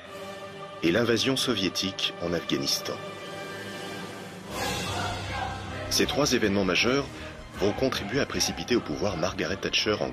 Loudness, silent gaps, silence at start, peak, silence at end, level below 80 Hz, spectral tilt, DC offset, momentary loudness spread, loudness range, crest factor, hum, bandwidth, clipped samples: -27 LUFS; none; 0 s; -12 dBFS; 0 s; -50 dBFS; -3.5 dB/octave; under 0.1%; 14 LU; 5 LU; 16 dB; none; 15.5 kHz; under 0.1%